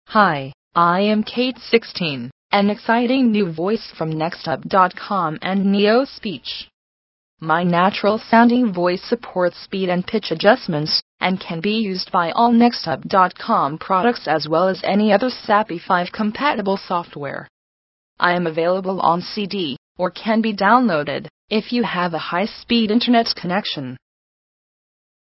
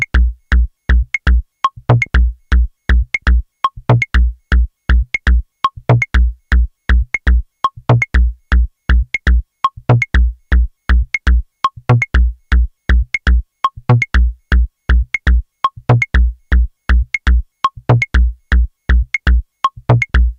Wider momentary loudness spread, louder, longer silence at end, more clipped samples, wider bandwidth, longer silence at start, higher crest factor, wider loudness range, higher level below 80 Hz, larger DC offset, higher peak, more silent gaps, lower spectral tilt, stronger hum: first, 9 LU vs 4 LU; second, -19 LUFS vs -15 LUFS; first, 1.4 s vs 0.05 s; neither; second, 5.8 kHz vs 7 kHz; about the same, 0.1 s vs 0 s; about the same, 18 dB vs 14 dB; about the same, 3 LU vs 1 LU; second, -60 dBFS vs -14 dBFS; neither; about the same, 0 dBFS vs 0 dBFS; first, 0.54-0.71 s, 2.32-2.50 s, 6.73-7.37 s, 11.02-11.18 s, 17.49-18.17 s, 19.78-19.95 s, 21.30-21.48 s vs none; first, -9 dB/octave vs -7 dB/octave; neither